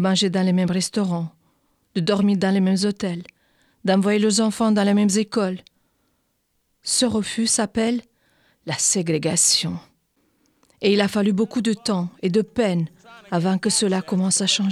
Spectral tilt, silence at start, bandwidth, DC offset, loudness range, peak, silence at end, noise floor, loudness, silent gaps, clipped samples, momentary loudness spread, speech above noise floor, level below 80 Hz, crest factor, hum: -4 dB/octave; 0 s; 13.5 kHz; under 0.1%; 3 LU; -6 dBFS; 0 s; -70 dBFS; -21 LUFS; none; under 0.1%; 10 LU; 50 dB; -60 dBFS; 16 dB; none